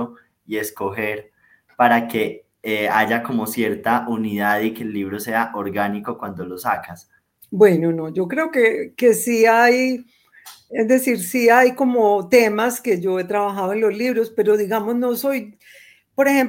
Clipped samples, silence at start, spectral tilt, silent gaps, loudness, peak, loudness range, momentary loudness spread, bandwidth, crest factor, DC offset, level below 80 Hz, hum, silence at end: under 0.1%; 0 s; -5 dB/octave; none; -19 LUFS; 0 dBFS; 5 LU; 12 LU; 17 kHz; 18 dB; under 0.1%; -64 dBFS; none; 0 s